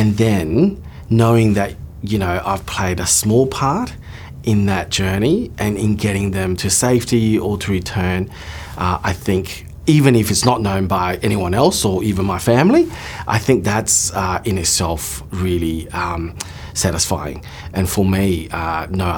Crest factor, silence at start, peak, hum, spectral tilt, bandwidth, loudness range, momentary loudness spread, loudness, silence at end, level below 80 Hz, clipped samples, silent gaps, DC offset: 16 dB; 0 s; 0 dBFS; none; -5 dB/octave; 20 kHz; 4 LU; 11 LU; -17 LUFS; 0 s; -36 dBFS; under 0.1%; none; under 0.1%